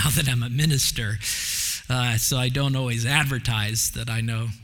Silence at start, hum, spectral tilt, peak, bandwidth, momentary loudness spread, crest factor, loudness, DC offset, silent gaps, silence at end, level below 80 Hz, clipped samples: 0 s; none; -3.5 dB/octave; -4 dBFS; 18 kHz; 5 LU; 20 dB; -23 LUFS; under 0.1%; none; 0 s; -42 dBFS; under 0.1%